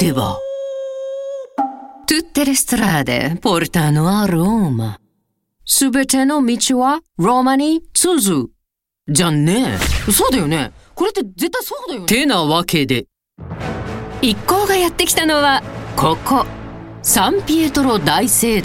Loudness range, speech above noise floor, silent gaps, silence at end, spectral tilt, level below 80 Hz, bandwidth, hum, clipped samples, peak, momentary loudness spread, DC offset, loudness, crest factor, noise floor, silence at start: 3 LU; 60 dB; none; 0 s; -4 dB/octave; -36 dBFS; 17 kHz; none; under 0.1%; 0 dBFS; 12 LU; under 0.1%; -16 LUFS; 16 dB; -75 dBFS; 0 s